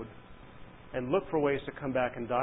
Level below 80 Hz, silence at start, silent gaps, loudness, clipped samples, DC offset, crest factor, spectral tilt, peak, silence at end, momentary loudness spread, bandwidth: -58 dBFS; 0 s; none; -32 LUFS; under 0.1%; under 0.1%; 18 dB; -3 dB/octave; -16 dBFS; 0 s; 23 LU; 3.9 kHz